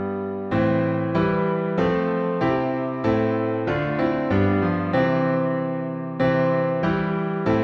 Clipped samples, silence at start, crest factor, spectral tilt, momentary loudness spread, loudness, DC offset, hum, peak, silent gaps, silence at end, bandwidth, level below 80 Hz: under 0.1%; 0 s; 14 dB; -9 dB/octave; 4 LU; -22 LUFS; under 0.1%; none; -8 dBFS; none; 0 s; 6.6 kHz; -48 dBFS